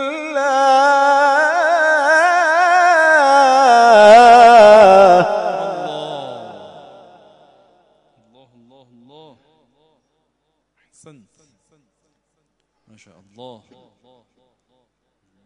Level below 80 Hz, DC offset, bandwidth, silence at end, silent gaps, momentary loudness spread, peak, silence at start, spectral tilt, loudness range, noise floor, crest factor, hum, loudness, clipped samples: -56 dBFS; under 0.1%; 10.5 kHz; 2 s; none; 19 LU; 0 dBFS; 0 s; -3 dB/octave; 17 LU; -70 dBFS; 14 dB; none; -10 LUFS; under 0.1%